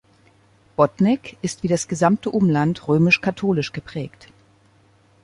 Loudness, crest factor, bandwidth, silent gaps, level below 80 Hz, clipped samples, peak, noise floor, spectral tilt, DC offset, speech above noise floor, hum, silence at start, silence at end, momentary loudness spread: -20 LUFS; 18 dB; 11.5 kHz; none; -56 dBFS; under 0.1%; -2 dBFS; -56 dBFS; -6 dB/octave; under 0.1%; 36 dB; none; 0.8 s; 1.15 s; 14 LU